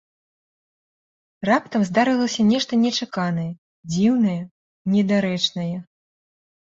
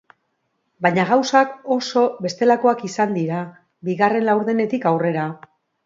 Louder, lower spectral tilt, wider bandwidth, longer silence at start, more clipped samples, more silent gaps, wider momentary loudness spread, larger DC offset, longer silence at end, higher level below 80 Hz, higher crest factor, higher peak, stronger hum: about the same, -21 LUFS vs -19 LUFS; about the same, -5.5 dB/octave vs -5.5 dB/octave; about the same, 7.8 kHz vs 7.8 kHz; first, 1.4 s vs 0.8 s; neither; first, 3.58-3.83 s, 4.51-4.85 s vs none; about the same, 12 LU vs 11 LU; neither; first, 0.8 s vs 0.5 s; first, -62 dBFS vs -70 dBFS; about the same, 18 dB vs 18 dB; about the same, -4 dBFS vs -2 dBFS; neither